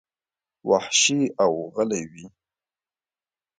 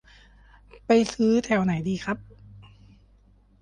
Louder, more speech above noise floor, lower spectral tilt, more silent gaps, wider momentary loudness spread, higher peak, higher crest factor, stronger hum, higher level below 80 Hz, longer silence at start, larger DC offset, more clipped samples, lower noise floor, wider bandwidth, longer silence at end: about the same, -22 LUFS vs -24 LUFS; first, over 67 dB vs 35 dB; second, -2.5 dB/octave vs -6 dB/octave; neither; about the same, 14 LU vs 12 LU; about the same, -6 dBFS vs -8 dBFS; about the same, 20 dB vs 20 dB; neither; second, -68 dBFS vs -54 dBFS; second, 0.65 s vs 0.9 s; neither; neither; first, under -90 dBFS vs -58 dBFS; about the same, 9.6 kHz vs 10.5 kHz; first, 1.3 s vs 1 s